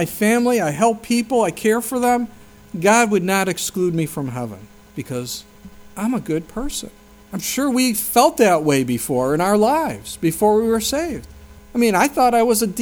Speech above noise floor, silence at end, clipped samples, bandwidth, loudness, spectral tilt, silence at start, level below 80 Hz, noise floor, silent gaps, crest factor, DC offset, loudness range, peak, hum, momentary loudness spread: 22 dB; 0 s; under 0.1%; over 20 kHz; -18 LUFS; -4.5 dB/octave; 0 s; -46 dBFS; -40 dBFS; none; 18 dB; under 0.1%; 8 LU; 0 dBFS; none; 14 LU